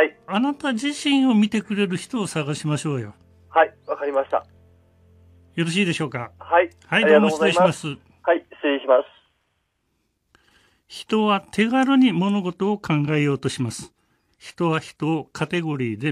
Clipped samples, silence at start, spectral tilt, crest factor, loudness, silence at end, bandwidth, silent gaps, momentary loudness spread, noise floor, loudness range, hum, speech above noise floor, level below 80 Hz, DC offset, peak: under 0.1%; 0 s; -5.5 dB/octave; 20 dB; -21 LUFS; 0 s; 12.5 kHz; none; 11 LU; -71 dBFS; 5 LU; none; 50 dB; -64 dBFS; under 0.1%; -2 dBFS